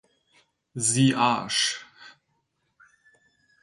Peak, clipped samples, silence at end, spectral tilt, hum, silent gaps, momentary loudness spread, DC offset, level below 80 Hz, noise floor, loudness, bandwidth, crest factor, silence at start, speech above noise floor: -8 dBFS; under 0.1%; 1.5 s; -3 dB/octave; none; none; 13 LU; under 0.1%; -68 dBFS; -74 dBFS; -23 LUFS; 11.5 kHz; 20 dB; 0.75 s; 51 dB